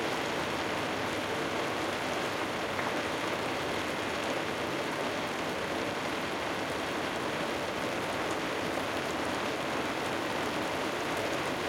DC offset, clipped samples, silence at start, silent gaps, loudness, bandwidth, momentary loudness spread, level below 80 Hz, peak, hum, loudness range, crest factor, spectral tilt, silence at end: under 0.1%; under 0.1%; 0 s; none; -32 LUFS; 17 kHz; 1 LU; -62 dBFS; -18 dBFS; none; 1 LU; 14 dB; -3.5 dB/octave; 0 s